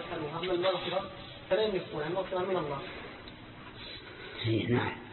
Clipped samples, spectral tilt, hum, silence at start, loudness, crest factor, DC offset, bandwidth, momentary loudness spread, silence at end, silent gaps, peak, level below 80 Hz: under 0.1%; -9.5 dB/octave; none; 0 s; -33 LUFS; 18 dB; under 0.1%; 4.4 kHz; 15 LU; 0 s; none; -16 dBFS; -58 dBFS